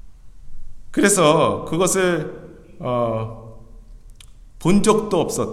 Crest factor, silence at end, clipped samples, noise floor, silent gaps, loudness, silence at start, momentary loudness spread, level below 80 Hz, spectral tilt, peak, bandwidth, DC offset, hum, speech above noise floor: 20 dB; 0 s; under 0.1%; -42 dBFS; none; -19 LUFS; 0.05 s; 17 LU; -40 dBFS; -4.5 dB/octave; 0 dBFS; 15.5 kHz; under 0.1%; none; 24 dB